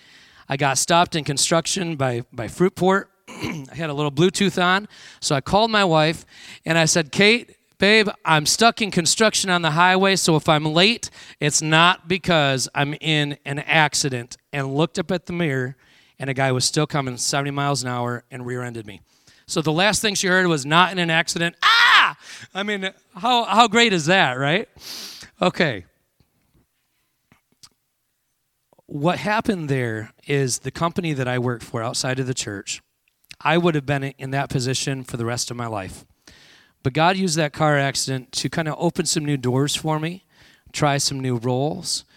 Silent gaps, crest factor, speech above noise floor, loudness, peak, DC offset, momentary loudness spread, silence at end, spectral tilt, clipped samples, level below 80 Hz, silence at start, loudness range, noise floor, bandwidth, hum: none; 22 dB; 52 dB; -20 LUFS; 0 dBFS; under 0.1%; 14 LU; 0.15 s; -3.5 dB/octave; under 0.1%; -54 dBFS; 0.5 s; 8 LU; -72 dBFS; 16.5 kHz; none